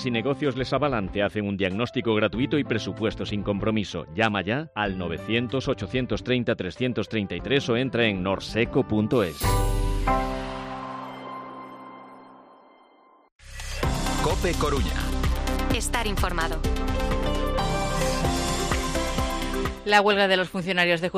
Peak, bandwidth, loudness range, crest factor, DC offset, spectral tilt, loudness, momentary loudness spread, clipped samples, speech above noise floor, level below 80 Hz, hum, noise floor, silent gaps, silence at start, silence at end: -6 dBFS; 15.5 kHz; 7 LU; 20 dB; under 0.1%; -5 dB/octave; -25 LUFS; 9 LU; under 0.1%; 32 dB; -32 dBFS; none; -56 dBFS; 13.32-13.39 s; 0 s; 0 s